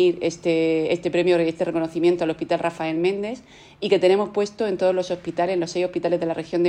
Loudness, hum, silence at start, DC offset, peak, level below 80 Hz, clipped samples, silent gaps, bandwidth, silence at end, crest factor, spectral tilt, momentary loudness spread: -22 LUFS; none; 0 s; under 0.1%; -6 dBFS; -60 dBFS; under 0.1%; none; 9.6 kHz; 0 s; 16 dB; -6 dB/octave; 6 LU